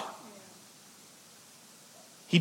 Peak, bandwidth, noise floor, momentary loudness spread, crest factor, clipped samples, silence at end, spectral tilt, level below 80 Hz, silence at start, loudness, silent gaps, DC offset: -10 dBFS; 16.5 kHz; -55 dBFS; 9 LU; 26 dB; under 0.1%; 0 s; -5 dB/octave; under -90 dBFS; 0 s; -36 LUFS; none; under 0.1%